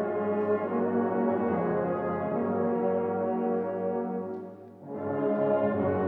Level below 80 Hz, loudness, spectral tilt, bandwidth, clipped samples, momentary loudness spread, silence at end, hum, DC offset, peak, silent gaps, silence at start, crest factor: -70 dBFS; -29 LUFS; -11 dB/octave; 3.9 kHz; under 0.1%; 9 LU; 0 s; none; under 0.1%; -14 dBFS; none; 0 s; 14 dB